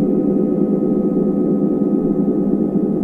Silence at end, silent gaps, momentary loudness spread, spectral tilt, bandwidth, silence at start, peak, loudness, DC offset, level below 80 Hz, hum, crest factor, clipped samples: 0 s; none; 1 LU; -12.5 dB/octave; 2.5 kHz; 0 s; -4 dBFS; -17 LUFS; under 0.1%; -46 dBFS; none; 12 dB; under 0.1%